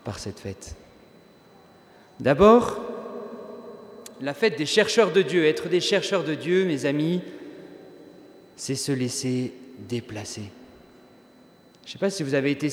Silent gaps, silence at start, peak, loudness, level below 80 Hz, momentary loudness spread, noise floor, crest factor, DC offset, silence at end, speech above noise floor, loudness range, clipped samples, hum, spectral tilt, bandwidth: none; 0.05 s; -2 dBFS; -23 LUFS; -54 dBFS; 22 LU; -54 dBFS; 24 dB; under 0.1%; 0 s; 31 dB; 9 LU; under 0.1%; none; -5 dB/octave; 18.5 kHz